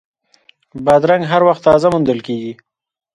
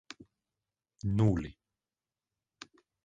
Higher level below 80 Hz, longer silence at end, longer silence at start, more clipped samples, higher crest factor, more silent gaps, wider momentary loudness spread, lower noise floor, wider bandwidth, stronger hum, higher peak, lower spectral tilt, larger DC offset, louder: about the same, -48 dBFS vs -52 dBFS; second, 0.6 s vs 1.55 s; second, 0.75 s vs 1.05 s; neither; second, 14 dB vs 22 dB; neither; second, 12 LU vs 24 LU; second, -53 dBFS vs under -90 dBFS; first, 11 kHz vs 7.8 kHz; neither; first, 0 dBFS vs -14 dBFS; about the same, -7 dB/octave vs -8 dB/octave; neither; first, -14 LUFS vs -31 LUFS